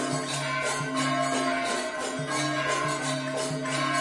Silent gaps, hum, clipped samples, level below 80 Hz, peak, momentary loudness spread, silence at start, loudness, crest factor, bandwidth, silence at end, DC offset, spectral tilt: none; none; under 0.1%; -64 dBFS; -14 dBFS; 3 LU; 0 s; -28 LUFS; 14 dB; 11.5 kHz; 0 s; under 0.1%; -3.5 dB/octave